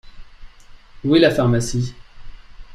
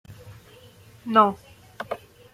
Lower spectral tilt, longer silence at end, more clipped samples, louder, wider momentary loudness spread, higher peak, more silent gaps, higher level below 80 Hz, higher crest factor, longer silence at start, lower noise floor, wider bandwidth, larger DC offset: about the same, -6 dB/octave vs -6 dB/octave; second, 0 s vs 0.4 s; neither; first, -18 LUFS vs -22 LUFS; second, 13 LU vs 25 LU; about the same, -2 dBFS vs -4 dBFS; neither; first, -40 dBFS vs -62 dBFS; second, 18 dB vs 24 dB; about the same, 0.05 s vs 0.1 s; second, -42 dBFS vs -50 dBFS; second, 13.5 kHz vs 15.5 kHz; neither